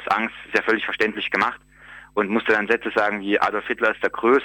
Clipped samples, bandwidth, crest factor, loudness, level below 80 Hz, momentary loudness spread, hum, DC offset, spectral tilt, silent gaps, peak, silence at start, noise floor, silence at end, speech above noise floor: under 0.1%; 17 kHz; 18 dB; -22 LUFS; -58 dBFS; 4 LU; none; under 0.1%; -5 dB/octave; none; -4 dBFS; 0 s; -45 dBFS; 0 s; 23 dB